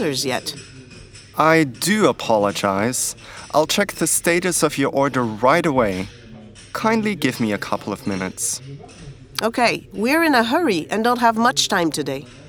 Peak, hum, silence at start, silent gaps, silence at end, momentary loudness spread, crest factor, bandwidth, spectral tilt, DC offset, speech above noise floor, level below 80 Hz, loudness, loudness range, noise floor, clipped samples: 0 dBFS; none; 0 s; none; 0 s; 13 LU; 20 dB; over 20 kHz; -3.5 dB/octave; under 0.1%; 22 dB; -52 dBFS; -19 LUFS; 5 LU; -41 dBFS; under 0.1%